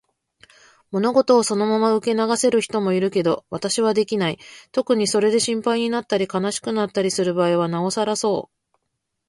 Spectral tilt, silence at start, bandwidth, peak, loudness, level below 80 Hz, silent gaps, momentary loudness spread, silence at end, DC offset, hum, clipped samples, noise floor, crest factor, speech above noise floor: -4.5 dB/octave; 0.9 s; 11.5 kHz; -4 dBFS; -20 LUFS; -64 dBFS; none; 6 LU; 0.85 s; under 0.1%; none; under 0.1%; -77 dBFS; 18 dB; 57 dB